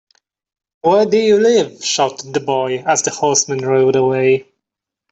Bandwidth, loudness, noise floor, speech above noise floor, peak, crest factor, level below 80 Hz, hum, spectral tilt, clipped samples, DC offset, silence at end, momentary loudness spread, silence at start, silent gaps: 8.4 kHz; -15 LUFS; -82 dBFS; 68 dB; -2 dBFS; 14 dB; -60 dBFS; none; -3.5 dB/octave; under 0.1%; under 0.1%; 0.7 s; 6 LU; 0.85 s; none